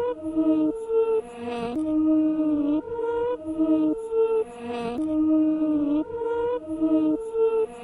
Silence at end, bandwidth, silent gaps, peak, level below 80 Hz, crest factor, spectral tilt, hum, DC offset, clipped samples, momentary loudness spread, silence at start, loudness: 0 s; 11 kHz; none; -12 dBFS; -56 dBFS; 12 dB; -7.5 dB/octave; none; under 0.1%; under 0.1%; 6 LU; 0 s; -25 LUFS